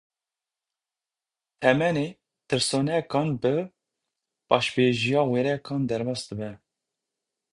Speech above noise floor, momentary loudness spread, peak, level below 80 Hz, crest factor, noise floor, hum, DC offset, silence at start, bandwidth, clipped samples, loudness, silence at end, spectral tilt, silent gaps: over 66 dB; 11 LU; -4 dBFS; -62 dBFS; 24 dB; under -90 dBFS; none; under 0.1%; 1.6 s; 11.5 kHz; under 0.1%; -25 LUFS; 0.95 s; -5 dB/octave; none